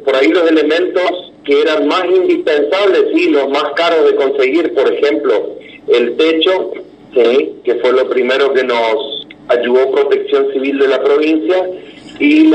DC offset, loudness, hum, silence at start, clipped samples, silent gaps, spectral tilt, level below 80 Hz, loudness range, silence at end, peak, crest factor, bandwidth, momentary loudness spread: under 0.1%; -12 LUFS; none; 0 s; under 0.1%; none; -4 dB/octave; -60 dBFS; 2 LU; 0 s; 0 dBFS; 12 dB; 8.6 kHz; 7 LU